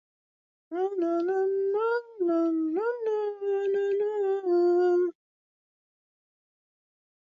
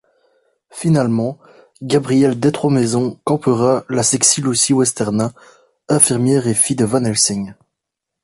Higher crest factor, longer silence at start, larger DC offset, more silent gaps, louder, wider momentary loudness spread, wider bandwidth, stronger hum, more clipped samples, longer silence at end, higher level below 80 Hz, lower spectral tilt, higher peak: about the same, 12 dB vs 16 dB; about the same, 0.7 s vs 0.75 s; neither; neither; second, -27 LUFS vs -15 LUFS; second, 6 LU vs 9 LU; second, 7 kHz vs 12 kHz; neither; neither; first, 2.1 s vs 0.7 s; second, -82 dBFS vs -54 dBFS; first, -6 dB/octave vs -4.5 dB/octave; second, -18 dBFS vs 0 dBFS